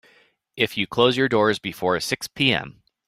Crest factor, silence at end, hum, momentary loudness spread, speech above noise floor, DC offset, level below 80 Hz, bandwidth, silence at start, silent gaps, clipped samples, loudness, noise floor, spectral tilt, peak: 20 dB; 0.35 s; none; 7 LU; 37 dB; under 0.1%; -58 dBFS; 16 kHz; 0.55 s; none; under 0.1%; -21 LUFS; -59 dBFS; -4.5 dB/octave; -2 dBFS